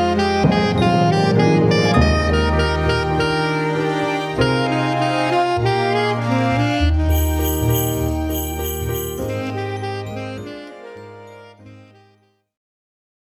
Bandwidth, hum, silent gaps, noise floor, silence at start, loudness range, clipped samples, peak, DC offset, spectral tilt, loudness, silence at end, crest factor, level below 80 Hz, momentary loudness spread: over 20 kHz; none; none; -58 dBFS; 0 s; 13 LU; under 0.1%; -2 dBFS; under 0.1%; -6 dB/octave; -18 LUFS; 1.45 s; 16 dB; -28 dBFS; 13 LU